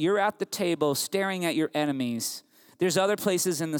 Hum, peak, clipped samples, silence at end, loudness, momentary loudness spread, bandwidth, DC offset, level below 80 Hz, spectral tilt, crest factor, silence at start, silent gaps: none; -10 dBFS; under 0.1%; 0 s; -27 LUFS; 5 LU; 20 kHz; under 0.1%; -78 dBFS; -4 dB/octave; 16 dB; 0 s; none